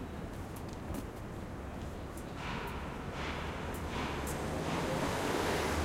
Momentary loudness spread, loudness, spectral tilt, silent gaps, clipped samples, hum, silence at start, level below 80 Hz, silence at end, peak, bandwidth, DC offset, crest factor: 10 LU; -38 LUFS; -5 dB/octave; none; under 0.1%; none; 0 s; -48 dBFS; 0 s; -22 dBFS; 16 kHz; under 0.1%; 16 dB